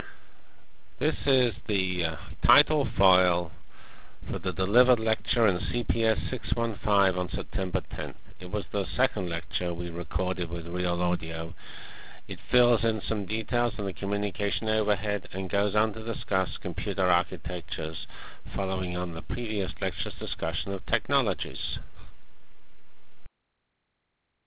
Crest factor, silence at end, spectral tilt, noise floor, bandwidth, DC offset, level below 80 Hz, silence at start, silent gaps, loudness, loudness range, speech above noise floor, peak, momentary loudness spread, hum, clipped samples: 24 dB; 0 s; -9.5 dB/octave; -78 dBFS; 4 kHz; 2%; -40 dBFS; 0 s; none; -28 LUFS; 6 LU; 50 dB; -6 dBFS; 13 LU; none; under 0.1%